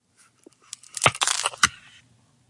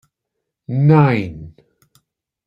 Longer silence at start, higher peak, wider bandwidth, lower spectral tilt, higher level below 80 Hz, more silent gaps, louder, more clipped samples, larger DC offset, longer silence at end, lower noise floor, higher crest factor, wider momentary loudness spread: first, 0.95 s vs 0.7 s; about the same, -2 dBFS vs -2 dBFS; first, 11.5 kHz vs 5.2 kHz; second, -0.5 dB/octave vs -10 dB/octave; second, -62 dBFS vs -52 dBFS; neither; second, -22 LUFS vs -15 LUFS; neither; neither; second, 0.75 s vs 1 s; second, -60 dBFS vs -79 dBFS; first, 26 dB vs 16 dB; about the same, 20 LU vs 19 LU